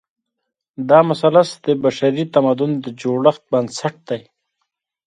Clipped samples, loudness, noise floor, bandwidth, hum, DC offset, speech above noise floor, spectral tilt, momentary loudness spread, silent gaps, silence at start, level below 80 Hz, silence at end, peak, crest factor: under 0.1%; -17 LUFS; -75 dBFS; 10.5 kHz; none; under 0.1%; 59 dB; -6.5 dB/octave; 13 LU; none; 0.8 s; -66 dBFS; 0.85 s; 0 dBFS; 18 dB